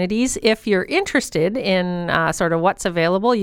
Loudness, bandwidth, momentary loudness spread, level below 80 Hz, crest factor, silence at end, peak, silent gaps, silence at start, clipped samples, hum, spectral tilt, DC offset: -19 LUFS; 17 kHz; 2 LU; -46 dBFS; 16 dB; 0 s; -2 dBFS; none; 0 s; under 0.1%; none; -4.5 dB/octave; under 0.1%